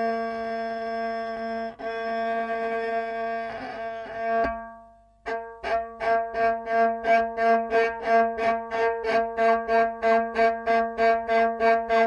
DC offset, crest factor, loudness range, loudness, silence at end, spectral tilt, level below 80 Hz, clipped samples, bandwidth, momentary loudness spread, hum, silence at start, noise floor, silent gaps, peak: under 0.1%; 16 dB; 7 LU; -25 LUFS; 0 s; -5 dB/octave; -56 dBFS; under 0.1%; 7.2 kHz; 11 LU; none; 0 s; -52 dBFS; none; -10 dBFS